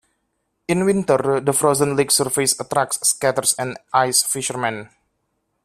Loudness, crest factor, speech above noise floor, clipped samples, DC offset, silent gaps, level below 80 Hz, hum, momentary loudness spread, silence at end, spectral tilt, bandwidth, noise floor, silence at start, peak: -18 LUFS; 18 dB; 53 dB; under 0.1%; under 0.1%; none; -58 dBFS; none; 7 LU; 0.8 s; -3 dB/octave; 16 kHz; -72 dBFS; 0.7 s; -2 dBFS